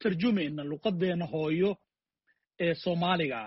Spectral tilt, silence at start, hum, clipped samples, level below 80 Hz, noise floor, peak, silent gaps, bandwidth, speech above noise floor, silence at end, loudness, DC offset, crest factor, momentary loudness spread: -5 dB/octave; 0 s; none; under 0.1%; -66 dBFS; -76 dBFS; -14 dBFS; none; 5.8 kHz; 47 dB; 0 s; -30 LUFS; under 0.1%; 16 dB; 5 LU